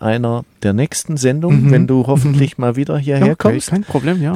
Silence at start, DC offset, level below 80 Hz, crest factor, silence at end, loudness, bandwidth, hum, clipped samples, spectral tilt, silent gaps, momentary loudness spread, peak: 0 s; under 0.1%; -46 dBFS; 14 dB; 0 s; -15 LUFS; 14 kHz; none; under 0.1%; -7 dB/octave; none; 7 LU; 0 dBFS